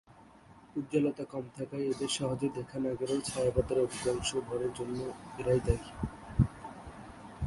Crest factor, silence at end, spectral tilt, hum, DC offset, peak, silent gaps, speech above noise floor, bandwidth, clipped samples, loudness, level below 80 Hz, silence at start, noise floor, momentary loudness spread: 22 dB; 0 s; -5.5 dB/octave; none; under 0.1%; -12 dBFS; none; 24 dB; 11.5 kHz; under 0.1%; -34 LUFS; -46 dBFS; 0.1 s; -57 dBFS; 11 LU